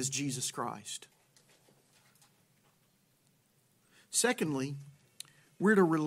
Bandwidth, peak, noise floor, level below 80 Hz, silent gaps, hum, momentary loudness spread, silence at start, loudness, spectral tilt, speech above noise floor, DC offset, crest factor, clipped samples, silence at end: 16 kHz; -14 dBFS; -71 dBFS; -82 dBFS; none; none; 23 LU; 0 s; -32 LUFS; -4 dB/octave; 40 dB; under 0.1%; 22 dB; under 0.1%; 0 s